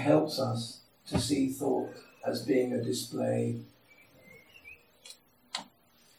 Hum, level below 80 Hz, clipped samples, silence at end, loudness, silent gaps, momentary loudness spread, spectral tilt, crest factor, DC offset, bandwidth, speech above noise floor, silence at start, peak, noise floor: none; -62 dBFS; under 0.1%; 0.55 s; -32 LUFS; none; 22 LU; -5.5 dB/octave; 22 dB; under 0.1%; 16.5 kHz; 34 dB; 0 s; -12 dBFS; -64 dBFS